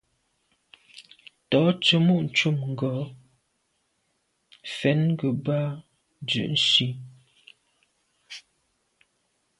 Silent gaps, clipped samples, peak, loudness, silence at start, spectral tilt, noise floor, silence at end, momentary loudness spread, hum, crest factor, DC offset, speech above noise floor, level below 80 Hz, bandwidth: none; under 0.1%; -6 dBFS; -23 LUFS; 0.95 s; -5.5 dB/octave; -73 dBFS; 1.2 s; 22 LU; none; 22 dB; under 0.1%; 50 dB; -66 dBFS; 11.5 kHz